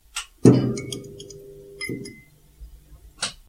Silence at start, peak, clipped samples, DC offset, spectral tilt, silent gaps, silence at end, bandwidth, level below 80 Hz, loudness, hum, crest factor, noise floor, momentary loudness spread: 0.15 s; 0 dBFS; under 0.1%; under 0.1%; -6 dB/octave; none; 0.15 s; 15.5 kHz; -50 dBFS; -23 LUFS; none; 24 dB; -50 dBFS; 24 LU